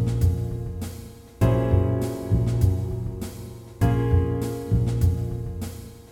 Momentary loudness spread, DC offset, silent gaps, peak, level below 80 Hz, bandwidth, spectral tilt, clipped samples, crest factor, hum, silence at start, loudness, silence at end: 14 LU; under 0.1%; none; -8 dBFS; -32 dBFS; 16 kHz; -8 dB/octave; under 0.1%; 16 dB; none; 0 s; -25 LUFS; 0.05 s